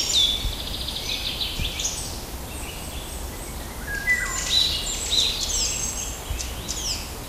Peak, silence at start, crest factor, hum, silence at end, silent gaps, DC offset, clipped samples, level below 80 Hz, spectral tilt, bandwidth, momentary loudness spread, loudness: -8 dBFS; 0 s; 18 dB; none; 0 s; none; under 0.1%; under 0.1%; -36 dBFS; -1 dB/octave; 16 kHz; 14 LU; -24 LUFS